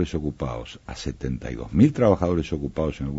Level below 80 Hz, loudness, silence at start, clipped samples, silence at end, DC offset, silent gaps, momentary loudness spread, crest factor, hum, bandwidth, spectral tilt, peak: -38 dBFS; -24 LUFS; 0 s; under 0.1%; 0 s; under 0.1%; none; 15 LU; 20 dB; none; 8 kHz; -7.5 dB/octave; -4 dBFS